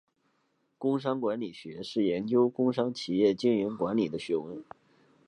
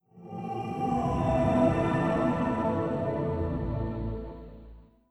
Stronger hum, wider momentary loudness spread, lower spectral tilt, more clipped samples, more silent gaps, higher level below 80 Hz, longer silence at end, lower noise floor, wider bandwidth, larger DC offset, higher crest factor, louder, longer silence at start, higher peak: neither; second, 11 LU vs 15 LU; second, -7 dB/octave vs -8.5 dB/octave; neither; neither; second, -70 dBFS vs -42 dBFS; first, 0.65 s vs 0.3 s; first, -74 dBFS vs -50 dBFS; about the same, 10.5 kHz vs 11 kHz; neither; about the same, 18 dB vs 18 dB; about the same, -29 LUFS vs -29 LUFS; first, 0.8 s vs 0.15 s; about the same, -12 dBFS vs -12 dBFS